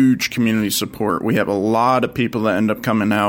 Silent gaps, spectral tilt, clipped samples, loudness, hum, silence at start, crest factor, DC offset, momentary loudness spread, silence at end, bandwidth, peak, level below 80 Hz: none; -5 dB/octave; under 0.1%; -18 LUFS; none; 0 s; 14 dB; under 0.1%; 4 LU; 0 s; 17 kHz; -2 dBFS; -52 dBFS